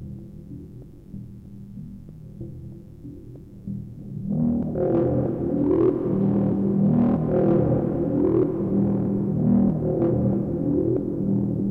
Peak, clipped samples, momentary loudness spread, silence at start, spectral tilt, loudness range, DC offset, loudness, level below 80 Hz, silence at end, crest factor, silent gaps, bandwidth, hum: -8 dBFS; under 0.1%; 21 LU; 0 s; -12.5 dB/octave; 18 LU; under 0.1%; -22 LUFS; -44 dBFS; 0 s; 14 dB; none; 3.1 kHz; none